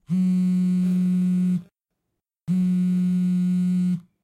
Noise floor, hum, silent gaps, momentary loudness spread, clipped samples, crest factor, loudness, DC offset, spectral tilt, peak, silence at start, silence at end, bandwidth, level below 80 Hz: -81 dBFS; none; none; 5 LU; under 0.1%; 6 dB; -22 LUFS; under 0.1%; -9 dB/octave; -16 dBFS; 0.1 s; 0.25 s; 8.8 kHz; -68 dBFS